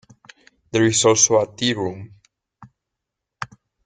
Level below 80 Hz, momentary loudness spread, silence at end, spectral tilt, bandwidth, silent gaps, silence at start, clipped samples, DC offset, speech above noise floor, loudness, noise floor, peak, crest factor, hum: -60 dBFS; 21 LU; 0.4 s; -3 dB/octave; 10.5 kHz; none; 0.75 s; under 0.1%; under 0.1%; 64 dB; -18 LUFS; -82 dBFS; -2 dBFS; 20 dB; none